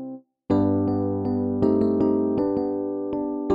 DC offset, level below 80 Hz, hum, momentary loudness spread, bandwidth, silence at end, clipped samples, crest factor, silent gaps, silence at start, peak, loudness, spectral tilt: under 0.1%; -52 dBFS; none; 7 LU; 5.2 kHz; 0 s; under 0.1%; 14 dB; none; 0 s; -8 dBFS; -23 LUFS; -11 dB/octave